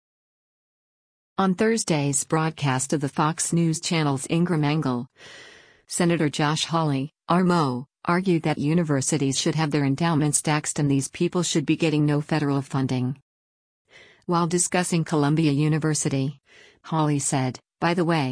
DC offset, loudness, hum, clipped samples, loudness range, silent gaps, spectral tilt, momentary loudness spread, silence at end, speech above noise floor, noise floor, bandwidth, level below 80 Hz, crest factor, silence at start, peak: under 0.1%; -23 LUFS; none; under 0.1%; 2 LU; 13.22-13.85 s; -5 dB/octave; 6 LU; 0 s; over 67 dB; under -90 dBFS; 10.5 kHz; -60 dBFS; 18 dB; 1.4 s; -6 dBFS